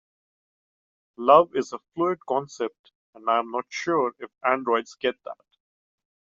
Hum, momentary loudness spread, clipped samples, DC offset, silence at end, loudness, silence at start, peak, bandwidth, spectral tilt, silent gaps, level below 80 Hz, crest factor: none; 15 LU; under 0.1%; under 0.1%; 1 s; -25 LUFS; 1.2 s; -4 dBFS; 7.6 kHz; -3 dB/octave; 2.79-2.84 s, 2.95-3.13 s; -74 dBFS; 24 dB